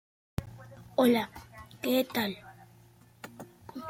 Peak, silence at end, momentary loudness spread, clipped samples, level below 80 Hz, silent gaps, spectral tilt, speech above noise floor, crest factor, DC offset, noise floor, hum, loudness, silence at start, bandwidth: -14 dBFS; 0 s; 23 LU; under 0.1%; -58 dBFS; none; -5 dB/octave; 30 dB; 20 dB; under 0.1%; -58 dBFS; none; -30 LUFS; 0.4 s; 16.5 kHz